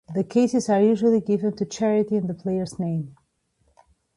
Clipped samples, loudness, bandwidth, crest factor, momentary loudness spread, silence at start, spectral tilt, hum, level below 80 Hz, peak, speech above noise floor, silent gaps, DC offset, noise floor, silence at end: under 0.1%; -23 LUFS; 11.5 kHz; 16 dB; 9 LU; 0.1 s; -7 dB/octave; none; -62 dBFS; -8 dBFS; 46 dB; none; under 0.1%; -68 dBFS; 1.05 s